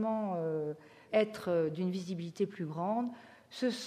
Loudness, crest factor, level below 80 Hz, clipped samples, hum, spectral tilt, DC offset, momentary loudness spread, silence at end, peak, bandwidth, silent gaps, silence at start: -35 LUFS; 18 dB; -80 dBFS; under 0.1%; none; -6.5 dB/octave; under 0.1%; 9 LU; 0 s; -16 dBFS; 15 kHz; none; 0 s